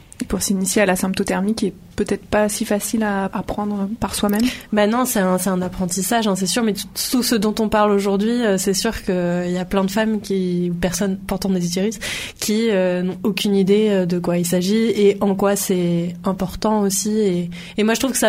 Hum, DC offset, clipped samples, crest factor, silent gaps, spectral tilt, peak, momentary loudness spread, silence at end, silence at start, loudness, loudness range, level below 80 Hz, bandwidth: none; under 0.1%; under 0.1%; 16 dB; none; -4.5 dB/octave; -2 dBFS; 7 LU; 0 s; 0.2 s; -19 LUFS; 3 LU; -44 dBFS; 16 kHz